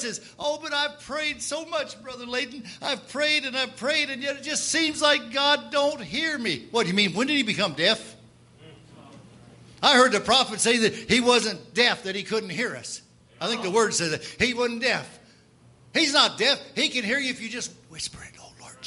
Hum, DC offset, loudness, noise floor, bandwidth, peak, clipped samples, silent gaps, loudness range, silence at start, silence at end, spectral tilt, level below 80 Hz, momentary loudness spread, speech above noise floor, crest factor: none; under 0.1%; -24 LUFS; -55 dBFS; 11.5 kHz; -2 dBFS; under 0.1%; none; 5 LU; 0 s; 0 s; -2 dB/octave; -62 dBFS; 13 LU; 30 dB; 22 dB